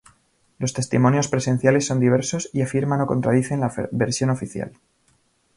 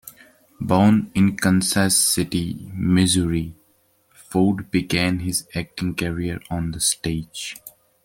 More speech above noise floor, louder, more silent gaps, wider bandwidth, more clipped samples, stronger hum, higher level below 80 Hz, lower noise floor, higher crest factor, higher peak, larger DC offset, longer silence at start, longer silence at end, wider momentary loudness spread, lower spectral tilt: about the same, 43 dB vs 41 dB; about the same, -21 LUFS vs -21 LUFS; neither; second, 11.5 kHz vs 17 kHz; neither; neither; second, -54 dBFS vs -46 dBFS; about the same, -63 dBFS vs -62 dBFS; about the same, 18 dB vs 18 dB; about the same, -4 dBFS vs -2 dBFS; neither; first, 0.6 s vs 0.05 s; first, 0.85 s vs 0.35 s; second, 9 LU vs 13 LU; first, -6 dB/octave vs -4.5 dB/octave